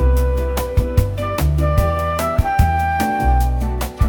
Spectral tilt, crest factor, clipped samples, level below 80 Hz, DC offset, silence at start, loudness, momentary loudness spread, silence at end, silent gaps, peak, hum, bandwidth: -6.5 dB/octave; 14 dB; under 0.1%; -20 dBFS; under 0.1%; 0 s; -18 LUFS; 4 LU; 0 s; none; -2 dBFS; none; 19 kHz